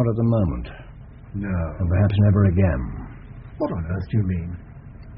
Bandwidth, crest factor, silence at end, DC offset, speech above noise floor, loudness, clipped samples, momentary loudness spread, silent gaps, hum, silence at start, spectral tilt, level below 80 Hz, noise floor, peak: 4.1 kHz; 16 dB; 0 s; under 0.1%; 21 dB; -22 LUFS; under 0.1%; 23 LU; none; none; 0 s; -9 dB/octave; -36 dBFS; -41 dBFS; -6 dBFS